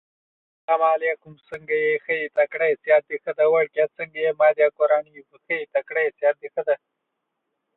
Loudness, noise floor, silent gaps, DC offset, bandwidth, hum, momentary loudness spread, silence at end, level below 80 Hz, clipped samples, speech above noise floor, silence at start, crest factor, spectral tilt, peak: -22 LUFS; -79 dBFS; none; under 0.1%; 4.1 kHz; none; 9 LU; 1 s; -76 dBFS; under 0.1%; 57 dB; 0.7 s; 18 dB; -6.5 dB/octave; -6 dBFS